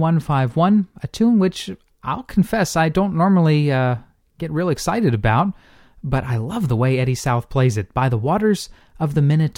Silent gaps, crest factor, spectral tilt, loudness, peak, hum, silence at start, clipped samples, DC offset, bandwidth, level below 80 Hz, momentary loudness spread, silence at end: none; 14 dB; -7 dB/octave; -19 LUFS; -4 dBFS; none; 0 s; under 0.1%; under 0.1%; 16 kHz; -42 dBFS; 11 LU; 0.05 s